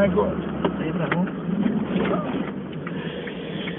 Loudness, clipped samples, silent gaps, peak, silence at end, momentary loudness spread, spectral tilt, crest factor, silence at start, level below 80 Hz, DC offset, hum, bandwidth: -26 LUFS; under 0.1%; none; -8 dBFS; 0 s; 8 LU; -11.5 dB/octave; 18 dB; 0 s; -48 dBFS; under 0.1%; none; 3.9 kHz